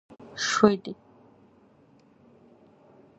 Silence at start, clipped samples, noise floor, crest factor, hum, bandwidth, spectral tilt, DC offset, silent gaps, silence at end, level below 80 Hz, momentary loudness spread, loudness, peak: 0.35 s; under 0.1%; -59 dBFS; 28 dB; none; 8.2 kHz; -4 dB/octave; under 0.1%; none; 2.25 s; -66 dBFS; 22 LU; -24 LUFS; -2 dBFS